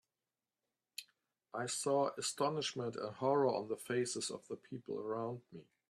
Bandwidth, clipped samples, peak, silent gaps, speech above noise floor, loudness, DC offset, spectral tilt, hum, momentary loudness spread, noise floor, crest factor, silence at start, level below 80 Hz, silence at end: 13.5 kHz; under 0.1%; -20 dBFS; none; over 52 dB; -38 LUFS; under 0.1%; -4 dB/octave; none; 16 LU; under -90 dBFS; 20 dB; 1 s; -84 dBFS; 0.25 s